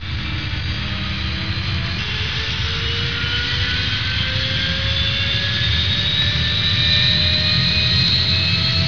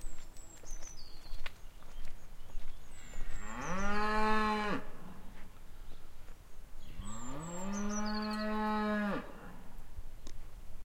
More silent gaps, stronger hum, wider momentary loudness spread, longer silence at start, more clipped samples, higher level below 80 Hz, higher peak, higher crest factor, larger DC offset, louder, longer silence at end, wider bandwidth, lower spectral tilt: neither; neither; second, 9 LU vs 22 LU; about the same, 0 s vs 0 s; neither; first, -30 dBFS vs -42 dBFS; first, -6 dBFS vs -16 dBFS; about the same, 14 dB vs 18 dB; first, 2% vs under 0.1%; first, -17 LUFS vs -37 LUFS; about the same, 0 s vs 0 s; second, 5.4 kHz vs 10 kHz; about the same, -4 dB/octave vs -4.5 dB/octave